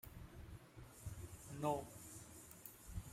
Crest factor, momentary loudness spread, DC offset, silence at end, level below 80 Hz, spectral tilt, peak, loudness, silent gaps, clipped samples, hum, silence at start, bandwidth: 24 dB; 15 LU; under 0.1%; 0 s; -62 dBFS; -5.5 dB/octave; -26 dBFS; -50 LUFS; none; under 0.1%; none; 0.05 s; 16 kHz